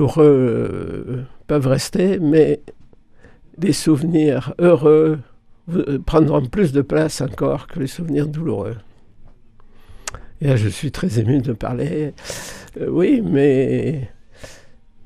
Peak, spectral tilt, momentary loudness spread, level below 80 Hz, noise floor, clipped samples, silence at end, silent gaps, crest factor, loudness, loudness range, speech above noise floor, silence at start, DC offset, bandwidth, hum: 0 dBFS; -7 dB/octave; 15 LU; -40 dBFS; -45 dBFS; under 0.1%; 0 s; none; 18 dB; -18 LUFS; 7 LU; 28 dB; 0 s; under 0.1%; 14.5 kHz; none